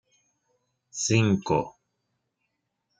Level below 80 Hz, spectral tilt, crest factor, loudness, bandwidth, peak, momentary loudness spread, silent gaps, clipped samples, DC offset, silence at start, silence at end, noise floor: -60 dBFS; -5 dB/octave; 22 dB; -25 LUFS; 9.6 kHz; -8 dBFS; 17 LU; none; under 0.1%; under 0.1%; 0.95 s; 1.3 s; -79 dBFS